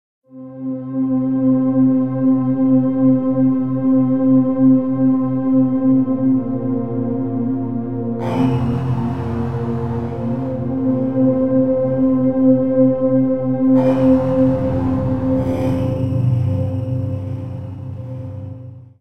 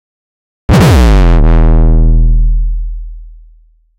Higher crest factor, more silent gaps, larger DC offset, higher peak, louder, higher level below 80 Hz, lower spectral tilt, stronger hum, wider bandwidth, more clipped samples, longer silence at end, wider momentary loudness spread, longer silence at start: first, 14 dB vs 6 dB; neither; first, 1% vs under 0.1%; about the same, -2 dBFS vs -2 dBFS; second, -17 LUFS vs -10 LUFS; second, -44 dBFS vs -8 dBFS; first, -11 dB/octave vs -7 dB/octave; neither; second, 3.5 kHz vs 11.5 kHz; neither; second, 0 s vs 0.7 s; second, 11 LU vs 16 LU; second, 0.2 s vs 0.7 s